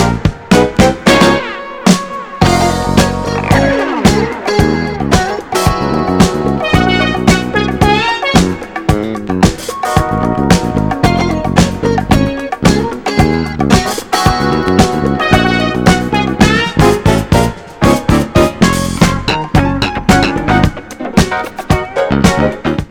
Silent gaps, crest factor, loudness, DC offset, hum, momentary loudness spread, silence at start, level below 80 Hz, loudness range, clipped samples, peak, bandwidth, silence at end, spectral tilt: none; 12 dB; -12 LUFS; under 0.1%; none; 5 LU; 0 s; -24 dBFS; 2 LU; 0.6%; 0 dBFS; 19 kHz; 0.05 s; -5.5 dB/octave